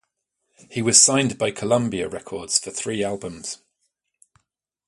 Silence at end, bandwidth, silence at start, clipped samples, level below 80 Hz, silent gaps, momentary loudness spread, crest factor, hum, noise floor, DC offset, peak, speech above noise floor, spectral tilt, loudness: 1.35 s; 11.5 kHz; 0.7 s; under 0.1%; -58 dBFS; none; 19 LU; 24 dB; none; -77 dBFS; under 0.1%; 0 dBFS; 55 dB; -2.5 dB/octave; -20 LUFS